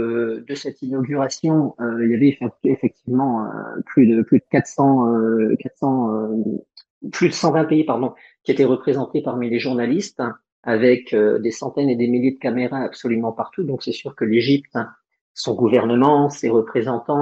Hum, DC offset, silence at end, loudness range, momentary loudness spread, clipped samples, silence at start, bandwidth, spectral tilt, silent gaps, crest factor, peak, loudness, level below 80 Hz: none; under 0.1%; 0 s; 3 LU; 11 LU; under 0.1%; 0 s; 8 kHz; -6.5 dB/octave; 6.90-7.01 s, 10.52-10.63 s, 15.21-15.35 s; 16 dB; -4 dBFS; -19 LUFS; -66 dBFS